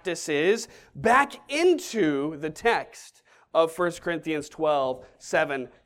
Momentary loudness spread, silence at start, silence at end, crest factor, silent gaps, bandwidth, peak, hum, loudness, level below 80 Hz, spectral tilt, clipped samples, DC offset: 9 LU; 0.05 s; 0.2 s; 18 dB; none; 16 kHz; -8 dBFS; none; -25 LUFS; -60 dBFS; -4 dB/octave; under 0.1%; under 0.1%